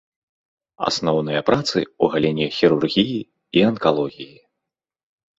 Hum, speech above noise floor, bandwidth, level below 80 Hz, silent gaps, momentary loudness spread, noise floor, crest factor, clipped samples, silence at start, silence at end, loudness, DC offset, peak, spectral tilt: none; 64 dB; 8 kHz; -56 dBFS; none; 9 LU; -84 dBFS; 20 dB; under 0.1%; 0.8 s; 1.15 s; -20 LUFS; under 0.1%; 0 dBFS; -5.5 dB/octave